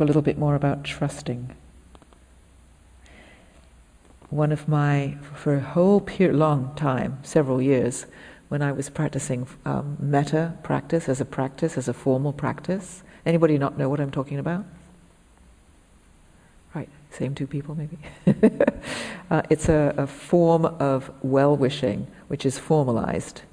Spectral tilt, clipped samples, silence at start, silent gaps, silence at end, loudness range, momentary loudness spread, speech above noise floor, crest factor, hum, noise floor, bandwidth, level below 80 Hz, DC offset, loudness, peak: -7 dB/octave; under 0.1%; 0 s; none; 0.1 s; 12 LU; 12 LU; 31 dB; 20 dB; none; -54 dBFS; 10.5 kHz; -50 dBFS; under 0.1%; -24 LUFS; -4 dBFS